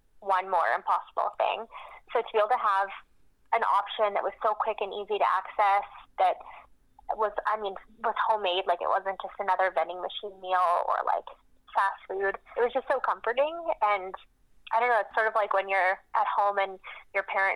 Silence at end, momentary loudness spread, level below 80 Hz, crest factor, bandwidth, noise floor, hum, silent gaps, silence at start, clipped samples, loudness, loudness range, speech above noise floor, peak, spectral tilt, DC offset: 0 s; 9 LU; -66 dBFS; 14 dB; 11.5 kHz; -49 dBFS; none; none; 0.2 s; under 0.1%; -28 LUFS; 2 LU; 21 dB; -14 dBFS; -3 dB/octave; under 0.1%